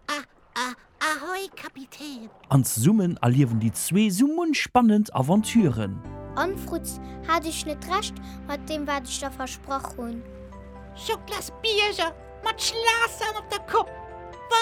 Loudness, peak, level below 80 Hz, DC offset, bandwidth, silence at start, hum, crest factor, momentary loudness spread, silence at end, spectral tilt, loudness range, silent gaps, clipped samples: -25 LUFS; -4 dBFS; -48 dBFS; under 0.1%; 17.5 kHz; 0.1 s; none; 20 dB; 17 LU; 0 s; -4.5 dB/octave; 9 LU; none; under 0.1%